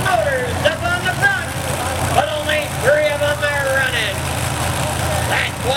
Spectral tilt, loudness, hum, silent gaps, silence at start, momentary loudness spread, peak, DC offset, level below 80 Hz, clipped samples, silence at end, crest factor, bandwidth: -3.5 dB/octave; -18 LUFS; none; none; 0 s; 5 LU; -2 dBFS; under 0.1%; -36 dBFS; under 0.1%; 0 s; 16 dB; 17 kHz